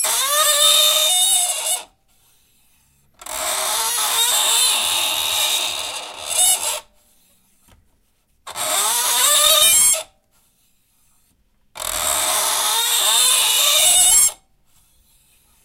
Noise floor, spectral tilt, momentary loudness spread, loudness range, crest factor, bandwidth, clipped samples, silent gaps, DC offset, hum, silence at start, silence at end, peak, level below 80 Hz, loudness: -62 dBFS; 3 dB/octave; 13 LU; 6 LU; 18 dB; 16 kHz; under 0.1%; none; under 0.1%; none; 0 s; 1.3 s; -2 dBFS; -54 dBFS; -14 LUFS